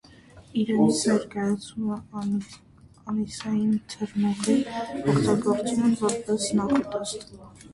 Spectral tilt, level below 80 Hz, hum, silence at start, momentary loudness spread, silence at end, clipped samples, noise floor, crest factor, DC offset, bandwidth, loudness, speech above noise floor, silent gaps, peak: -5.5 dB/octave; -56 dBFS; none; 0.35 s; 10 LU; 0 s; under 0.1%; -50 dBFS; 16 dB; under 0.1%; 11.5 kHz; -26 LUFS; 25 dB; none; -10 dBFS